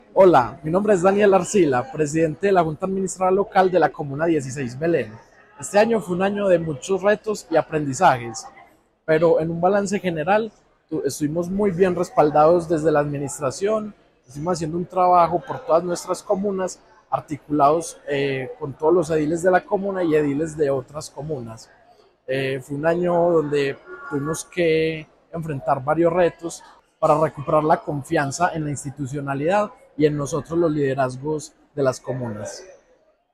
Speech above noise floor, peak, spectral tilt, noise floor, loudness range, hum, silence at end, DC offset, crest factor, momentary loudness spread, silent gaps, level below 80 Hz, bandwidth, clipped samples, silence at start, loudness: 39 dB; -4 dBFS; -6 dB/octave; -60 dBFS; 3 LU; none; 0.6 s; under 0.1%; 16 dB; 12 LU; none; -54 dBFS; 14 kHz; under 0.1%; 0.15 s; -21 LUFS